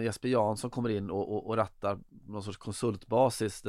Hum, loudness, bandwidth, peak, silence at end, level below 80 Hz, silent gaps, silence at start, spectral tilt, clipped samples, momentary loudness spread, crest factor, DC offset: none; -32 LUFS; 14.5 kHz; -14 dBFS; 0 s; -62 dBFS; none; 0 s; -6 dB/octave; under 0.1%; 13 LU; 18 dB; under 0.1%